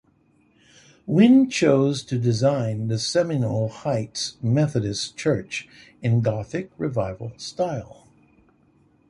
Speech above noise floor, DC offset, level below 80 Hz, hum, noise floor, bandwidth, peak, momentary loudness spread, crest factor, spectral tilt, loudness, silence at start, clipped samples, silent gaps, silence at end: 39 dB; under 0.1%; -54 dBFS; none; -61 dBFS; 11.5 kHz; -4 dBFS; 13 LU; 20 dB; -6 dB/octave; -23 LUFS; 1.05 s; under 0.1%; none; 1.15 s